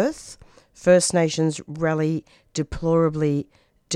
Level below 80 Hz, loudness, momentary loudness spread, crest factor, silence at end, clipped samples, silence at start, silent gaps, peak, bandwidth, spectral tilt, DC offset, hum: -46 dBFS; -22 LUFS; 15 LU; 18 dB; 0 s; under 0.1%; 0 s; none; -4 dBFS; 13 kHz; -5 dB/octave; under 0.1%; none